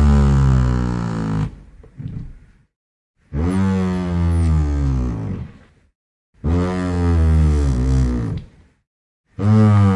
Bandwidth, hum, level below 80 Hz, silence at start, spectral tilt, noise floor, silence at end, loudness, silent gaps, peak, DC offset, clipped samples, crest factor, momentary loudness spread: 10.5 kHz; none; -24 dBFS; 0 s; -8.5 dB/octave; -43 dBFS; 0 s; -18 LUFS; 2.76-3.14 s, 5.95-6.33 s, 8.87-9.24 s; -4 dBFS; under 0.1%; under 0.1%; 14 dB; 17 LU